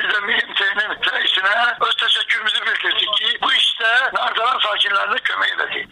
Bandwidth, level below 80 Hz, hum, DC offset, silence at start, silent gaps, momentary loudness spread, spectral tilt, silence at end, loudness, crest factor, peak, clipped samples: 12 kHz; -62 dBFS; none; under 0.1%; 0 s; none; 4 LU; 0 dB/octave; 0.05 s; -16 LUFS; 14 dB; -6 dBFS; under 0.1%